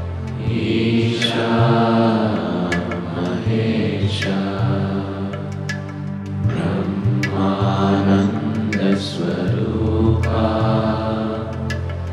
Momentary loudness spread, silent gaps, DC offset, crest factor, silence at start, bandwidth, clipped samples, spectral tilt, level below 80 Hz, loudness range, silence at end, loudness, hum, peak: 9 LU; none; under 0.1%; 14 dB; 0 s; 11 kHz; under 0.1%; -7 dB/octave; -40 dBFS; 4 LU; 0 s; -19 LUFS; none; -4 dBFS